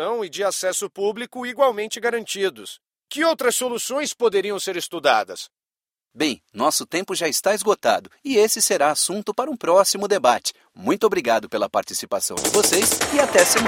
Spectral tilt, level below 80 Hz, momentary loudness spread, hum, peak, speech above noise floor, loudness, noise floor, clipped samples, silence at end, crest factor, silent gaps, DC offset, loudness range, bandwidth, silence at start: -1.5 dB/octave; -60 dBFS; 9 LU; none; 0 dBFS; over 69 dB; -21 LUFS; under -90 dBFS; under 0.1%; 0 s; 22 dB; none; under 0.1%; 4 LU; 16.5 kHz; 0 s